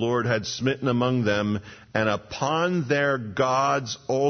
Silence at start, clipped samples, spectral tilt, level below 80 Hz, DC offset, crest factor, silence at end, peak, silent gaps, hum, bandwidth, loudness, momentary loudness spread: 0 s; under 0.1%; -5.5 dB/octave; -58 dBFS; under 0.1%; 16 dB; 0 s; -8 dBFS; none; none; 6.6 kHz; -25 LUFS; 5 LU